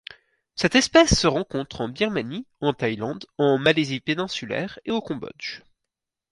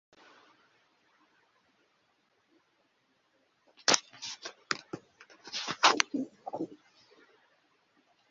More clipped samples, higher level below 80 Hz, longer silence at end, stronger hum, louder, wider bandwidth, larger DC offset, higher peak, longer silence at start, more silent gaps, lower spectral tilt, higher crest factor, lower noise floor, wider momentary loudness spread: neither; first, -42 dBFS vs -84 dBFS; second, 0.75 s vs 1.55 s; neither; first, -23 LUFS vs -31 LUFS; first, 11.5 kHz vs 7.6 kHz; neither; about the same, -4 dBFS vs -2 dBFS; second, 0.55 s vs 3.85 s; neither; first, -4 dB/octave vs 0.5 dB/octave; second, 20 dB vs 36 dB; first, -85 dBFS vs -73 dBFS; about the same, 17 LU vs 19 LU